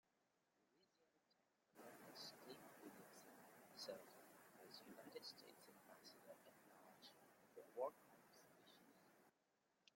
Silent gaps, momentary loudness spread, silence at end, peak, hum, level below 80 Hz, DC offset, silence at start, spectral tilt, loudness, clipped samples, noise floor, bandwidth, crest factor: none; 15 LU; 0 s; -36 dBFS; none; under -90 dBFS; under 0.1%; 0.2 s; -3 dB/octave; -60 LUFS; under 0.1%; -87 dBFS; 16.5 kHz; 26 dB